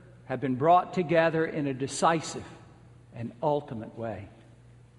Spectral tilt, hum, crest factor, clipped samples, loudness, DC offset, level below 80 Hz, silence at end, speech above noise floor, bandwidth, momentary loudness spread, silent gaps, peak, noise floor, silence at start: -5.5 dB/octave; none; 20 dB; under 0.1%; -28 LUFS; under 0.1%; -64 dBFS; 0.65 s; 26 dB; 11.5 kHz; 18 LU; none; -8 dBFS; -54 dBFS; 0.05 s